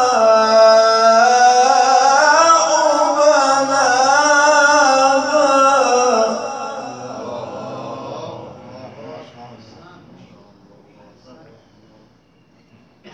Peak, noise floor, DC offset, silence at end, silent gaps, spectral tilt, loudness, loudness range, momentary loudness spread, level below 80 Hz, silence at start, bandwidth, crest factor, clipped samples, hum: 0 dBFS; -53 dBFS; under 0.1%; 0.05 s; none; -1.5 dB/octave; -12 LUFS; 20 LU; 19 LU; -66 dBFS; 0 s; 10 kHz; 14 dB; under 0.1%; none